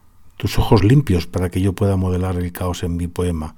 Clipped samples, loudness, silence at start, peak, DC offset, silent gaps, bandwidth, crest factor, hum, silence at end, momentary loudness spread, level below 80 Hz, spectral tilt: under 0.1%; -19 LUFS; 0.25 s; -2 dBFS; under 0.1%; none; 17.5 kHz; 16 dB; none; 0.05 s; 10 LU; -30 dBFS; -7 dB/octave